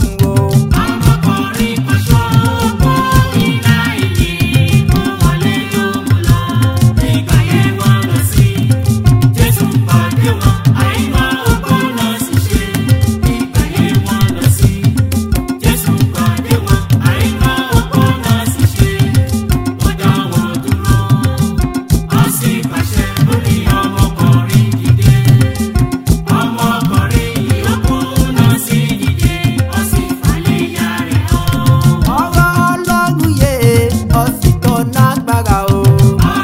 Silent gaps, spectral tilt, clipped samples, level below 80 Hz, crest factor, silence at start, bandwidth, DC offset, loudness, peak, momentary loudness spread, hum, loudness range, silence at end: none; -6 dB/octave; 0.6%; -22 dBFS; 10 dB; 0 s; 16.5 kHz; under 0.1%; -12 LUFS; 0 dBFS; 4 LU; none; 2 LU; 0 s